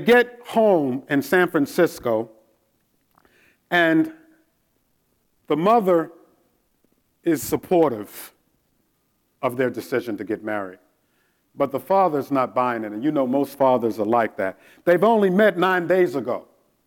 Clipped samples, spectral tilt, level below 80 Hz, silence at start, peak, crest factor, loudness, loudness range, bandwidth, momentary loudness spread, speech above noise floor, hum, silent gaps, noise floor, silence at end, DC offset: under 0.1%; -6 dB/octave; -64 dBFS; 0 s; -4 dBFS; 18 dB; -21 LUFS; 7 LU; 17.5 kHz; 11 LU; 48 dB; none; none; -68 dBFS; 0.45 s; under 0.1%